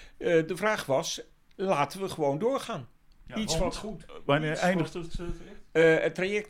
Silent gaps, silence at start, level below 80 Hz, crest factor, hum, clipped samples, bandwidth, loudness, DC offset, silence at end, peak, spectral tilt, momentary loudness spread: none; 0 s; -46 dBFS; 16 dB; none; under 0.1%; 16 kHz; -28 LUFS; under 0.1%; 0 s; -12 dBFS; -5 dB/octave; 15 LU